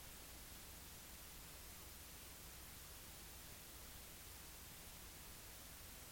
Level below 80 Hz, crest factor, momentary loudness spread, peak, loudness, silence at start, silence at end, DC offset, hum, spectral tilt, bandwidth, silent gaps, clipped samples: -64 dBFS; 14 dB; 0 LU; -44 dBFS; -55 LUFS; 0 s; 0 s; under 0.1%; none; -2 dB/octave; 17 kHz; none; under 0.1%